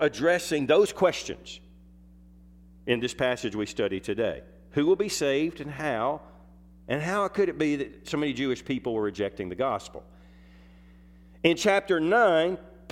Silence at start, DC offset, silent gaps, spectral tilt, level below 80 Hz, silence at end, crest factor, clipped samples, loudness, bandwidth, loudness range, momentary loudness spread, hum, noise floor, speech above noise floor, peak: 0 s; under 0.1%; none; -4.5 dB/octave; -56 dBFS; 0.2 s; 22 dB; under 0.1%; -27 LUFS; 15.5 kHz; 5 LU; 12 LU; none; -52 dBFS; 26 dB; -6 dBFS